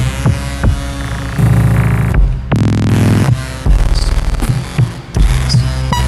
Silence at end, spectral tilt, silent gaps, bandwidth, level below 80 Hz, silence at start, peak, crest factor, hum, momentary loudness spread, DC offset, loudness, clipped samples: 0 s; -6 dB/octave; none; 14 kHz; -16 dBFS; 0 s; 0 dBFS; 12 dB; none; 6 LU; under 0.1%; -14 LUFS; under 0.1%